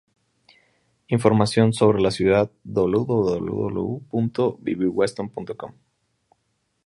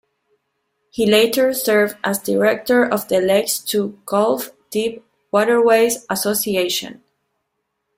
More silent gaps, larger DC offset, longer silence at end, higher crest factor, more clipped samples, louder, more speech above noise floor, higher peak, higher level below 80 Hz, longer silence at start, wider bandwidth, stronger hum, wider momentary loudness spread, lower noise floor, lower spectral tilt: neither; neither; about the same, 1.15 s vs 1.05 s; about the same, 20 dB vs 16 dB; neither; second, -22 LUFS vs -18 LUFS; second, 51 dB vs 57 dB; about the same, -2 dBFS vs -2 dBFS; first, -52 dBFS vs -60 dBFS; first, 1.1 s vs 0.95 s; second, 11.5 kHz vs 16.5 kHz; neither; first, 13 LU vs 9 LU; about the same, -72 dBFS vs -74 dBFS; first, -7 dB/octave vs -3.5 dB/octave